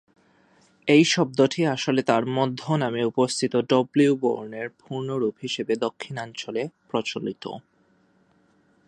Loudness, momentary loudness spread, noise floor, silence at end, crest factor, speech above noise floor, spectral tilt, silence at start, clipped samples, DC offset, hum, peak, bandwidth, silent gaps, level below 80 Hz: -24 LUFS; 13 LU; -63 dBFS; 1.25 s; 20 dB; 39 dB; -5 dB/octave; 0.85 s; under 0.1%; under 0.1%; none; -4 dBFS; 11.5 kHz; none; -72 dBFS